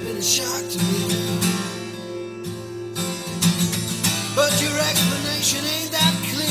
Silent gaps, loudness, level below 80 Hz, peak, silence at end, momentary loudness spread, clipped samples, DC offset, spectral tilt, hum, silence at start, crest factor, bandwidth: none; -21 LUFS; -52 dBFS; -4 dBFS; 0 s; 13 LU; under 0.1%; under 0.1%; -3 dB/octave; none; 0 s; 18 dB; 16 kHz